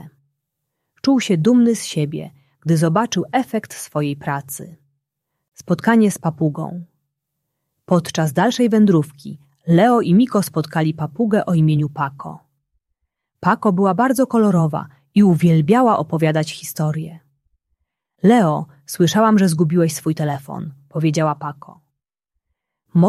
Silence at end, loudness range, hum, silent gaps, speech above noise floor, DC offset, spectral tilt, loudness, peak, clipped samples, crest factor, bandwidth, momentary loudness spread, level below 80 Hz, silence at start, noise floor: 0 s; 5 LU; none; none; 61 dB; under 0.1%; -6.5 dB/octave; -17 LUFS; -2 dBFS; under 0.1%; 16 dB; 14.5 kHz; 15 LU; -60 dBFS; 0.05 s; -78 dBFS